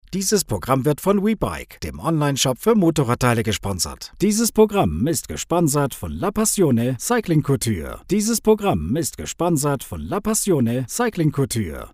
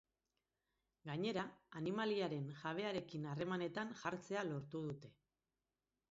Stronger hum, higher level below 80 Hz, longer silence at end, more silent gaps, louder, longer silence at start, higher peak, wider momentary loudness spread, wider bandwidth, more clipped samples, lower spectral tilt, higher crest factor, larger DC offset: neither; first, -42 dBFS vs -80 dBFS; second, 0.05 s vs 1 s; neither; first, -20 LUFS vs -44 LUFS; second, 0.1 s vs 1.05 s; first, -2 dBFS vs -26 dBFS; about the same, 8 LU vs 8 LU; first, 16 kHz vs 7.6 kHz; neither; about the same, -5 dB/octave vs -5 dB/octave; about the same, 18 dB vs 20 dB; neither